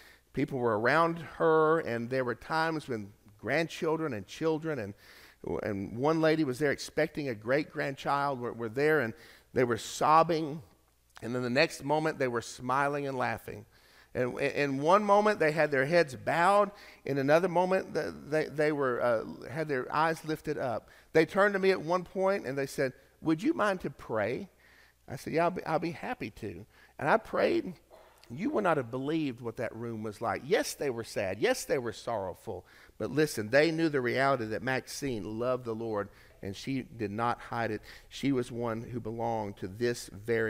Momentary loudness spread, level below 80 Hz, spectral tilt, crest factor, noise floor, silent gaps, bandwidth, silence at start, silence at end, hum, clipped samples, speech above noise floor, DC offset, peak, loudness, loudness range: 13 LU; -62 dBFS; -5.5 dB/octave; 20 dB; -61 dBFS; none; 16 kHz; 0.35 s; 0 s; none; under 0.1%; 31 dB; under 0.1%; -10 dBFS; -31 LUFS; 6 LU